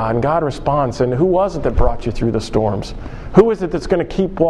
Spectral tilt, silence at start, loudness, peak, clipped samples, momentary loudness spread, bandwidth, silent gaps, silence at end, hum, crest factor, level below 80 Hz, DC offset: -7.5 dB/octave; 0 s; -17 LUFS; 0 dBFS; under 0.1%; 7 LU; 10.5 kHz; none; 0 s; none; 16 dB; -26 dBFS; under 0.1%